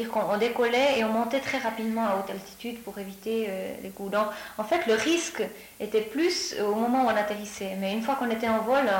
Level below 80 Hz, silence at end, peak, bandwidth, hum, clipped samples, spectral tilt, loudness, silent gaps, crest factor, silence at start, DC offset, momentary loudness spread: -64 dBFS; 0 s; -14 dBFS; 17 kHz; none; under 0.1%; -3.5 dB/octave; -27 LUFS; none; 14 dB; 0 s; under 0.1%; 13 LU